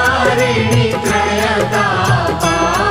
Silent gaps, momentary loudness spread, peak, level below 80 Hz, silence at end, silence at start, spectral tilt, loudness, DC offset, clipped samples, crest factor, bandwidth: none; 2 LU; 0 dBFS; -34 dBFS; 0 s; 0 s; -4.5 dB/octave; -14 LUFS; under 0.1%; under 0.1%; 12 dB; 16.5 kHz